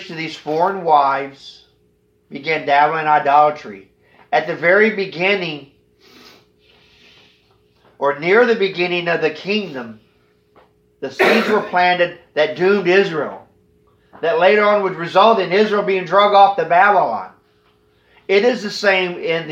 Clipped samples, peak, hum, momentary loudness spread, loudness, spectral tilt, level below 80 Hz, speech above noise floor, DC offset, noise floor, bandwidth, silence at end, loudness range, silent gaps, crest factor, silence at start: under 0.1%; 0 dBFS; none; 15 LU; -16 LUFS; -5 dB/octave; -68 dBFS; 44 dB; under 0.1%; -59 dBFS; 15 kHz; 0 s; 6 LU; none; 16 dB; 0 s